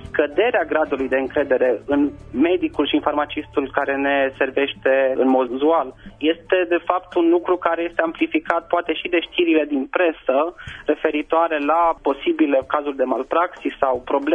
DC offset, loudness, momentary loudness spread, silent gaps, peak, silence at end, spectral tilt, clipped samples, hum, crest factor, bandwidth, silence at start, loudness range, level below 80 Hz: under 0.1%; -20 LUFS; 5 LU; none; 0 dBFS; 0 s; -6.5 dB/octave; under 0.1%; none; 20 dB; 3.8 kHz; 0 s; 1 LU; -50 dBFS